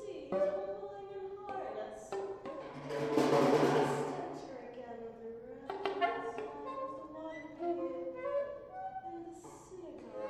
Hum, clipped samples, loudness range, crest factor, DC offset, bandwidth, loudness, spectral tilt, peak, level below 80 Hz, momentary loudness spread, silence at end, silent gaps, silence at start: none; under 0.1%; 7 LU; 22 dB; under 0.1%; 15 kHz; -37 LUFS; -6 dB/octave; -16 dBFS; -70 dBFS; 17 LU; 0 s; none; 0 s